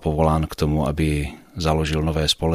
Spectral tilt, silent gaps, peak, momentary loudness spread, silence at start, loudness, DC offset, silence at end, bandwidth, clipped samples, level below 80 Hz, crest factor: -5.5 dB/octave; none; -4 dBFS; 6 LU; 0 s; -22 LUFS; 0.1%; 0 s; 15 kHz; under 0.1%; -30 dBFS; 16 dB